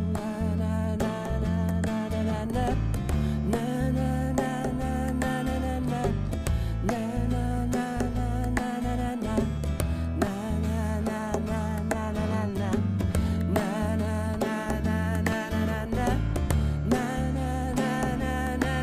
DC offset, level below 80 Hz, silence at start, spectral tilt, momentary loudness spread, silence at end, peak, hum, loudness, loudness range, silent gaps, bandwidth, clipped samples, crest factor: under 0.1%; -34 dBFS; 0 s; -7 dB/octave; 3 LU; 0 s; -10 dBFS; none; -28 LUFS; 1 LU; none; 15.5 kHz; under 0.1%; 18 dB